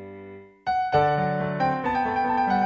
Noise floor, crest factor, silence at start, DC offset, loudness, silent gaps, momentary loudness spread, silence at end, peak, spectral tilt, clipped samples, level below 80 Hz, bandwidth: -43 dBFS; 16 dB; 0 s; under 0.1%; -24 LUFS; none; 18 LU; 0 s; -8 dBFS; -7.5 dB/octave; under 0.1%; -52 dBFS; 7 kHz